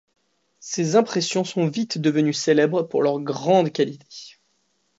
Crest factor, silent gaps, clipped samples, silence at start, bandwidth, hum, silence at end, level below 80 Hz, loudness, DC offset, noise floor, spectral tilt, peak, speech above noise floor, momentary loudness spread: 18 dB; none; under 0.1%; 0.6 s; 8 kHz; none; 0.7 s; -72 dBFS; -21 LUFS; under 0.1%; -69 dBFS; -5 dB/octave; -4 dBFS; 48 dB; 13 LU